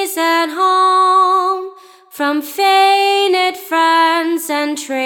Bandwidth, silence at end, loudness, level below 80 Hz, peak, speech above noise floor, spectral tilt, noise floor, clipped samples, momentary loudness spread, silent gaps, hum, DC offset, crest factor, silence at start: over 20 kHz; 0 s; -13 LUFS; -82 dBFS; -2 dBFS; 23 dB; 0 dB/octave; -37 dBFS; under 0.1%; 8 LU; none; none; under 0.1%; 12 dB; 0 s